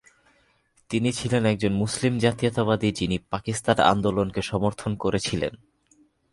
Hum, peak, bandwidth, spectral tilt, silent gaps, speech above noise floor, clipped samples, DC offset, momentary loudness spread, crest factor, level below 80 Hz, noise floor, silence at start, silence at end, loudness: none; -2 dBFS; 11.5 kHz; -5.5 dB/octave; none; 40 dB; under 0.1%; under 0.1%; 8 LU; 22 dB; -48 dBFS; -64 dBFS; 0.9 s; 0.75 s; -24 LUFS